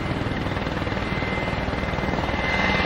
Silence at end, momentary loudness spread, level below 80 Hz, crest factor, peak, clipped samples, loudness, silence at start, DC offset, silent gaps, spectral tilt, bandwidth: 0 s; 4 LU; -34 dBFS; 16 dB; -8 dBFS; under 0.1%; -25 LUFS; 0 s; under 0.1%; none; -6 dB/octave; 16 kHz